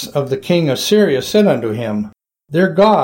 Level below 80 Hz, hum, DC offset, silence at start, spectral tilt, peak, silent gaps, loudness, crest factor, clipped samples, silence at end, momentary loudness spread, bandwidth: -52 dBFS; none; under 0.1%; 0 s; -5.5 dB/octave; -2 dBFS; none; -15 LUFS; 12 dB; under 0.1%; 0 s; 9 LU; 17 kHz